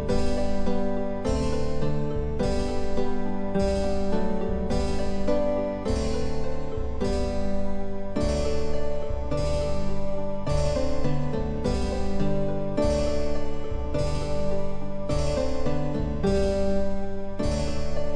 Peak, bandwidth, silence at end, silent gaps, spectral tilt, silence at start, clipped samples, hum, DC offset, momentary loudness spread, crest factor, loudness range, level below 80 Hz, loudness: -10 dBFS; 9.8 kHz; 0 s; none; -6.5 dB/octave; 0 s; under 0.1%; none; under 0.1%; 6 LU; 12 dB; 2 LU; -30 dBFS; -28 LUFS